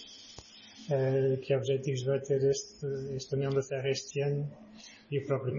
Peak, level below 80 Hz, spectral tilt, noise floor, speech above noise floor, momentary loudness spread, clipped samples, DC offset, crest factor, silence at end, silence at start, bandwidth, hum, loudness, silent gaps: -18 dBFS; -68 dBFS; -6 dB/octave; -52 dBFS; 21 dB; 20 LU; under 0.1%; under 0.1%; 14 dB; 0 s; 0 s; 7.4 kHz; none; -32 LUFS; none